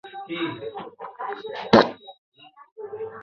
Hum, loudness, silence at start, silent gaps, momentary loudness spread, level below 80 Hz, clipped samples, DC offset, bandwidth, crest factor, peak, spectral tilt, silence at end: none; -24 LUFS; 0.05 s; 2.18-2.32 s, 2.72-2.76 s; 21 LU; -60 dBFS; under 0.1%; under 0.1%; 7.2 kHz; 24 dB; -2 dBFS; -6 dB/octave; 0 s